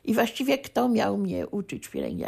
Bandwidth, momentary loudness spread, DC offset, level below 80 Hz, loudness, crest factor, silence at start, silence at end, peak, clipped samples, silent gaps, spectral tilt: 15.5 kHz; 9 LU; under 0.1%; -58 dBFS; -27 LUFS; 14 dB; 0.05 s; 0 s; -12 dBFS; under 0.1%; none; -5.5 dB/octave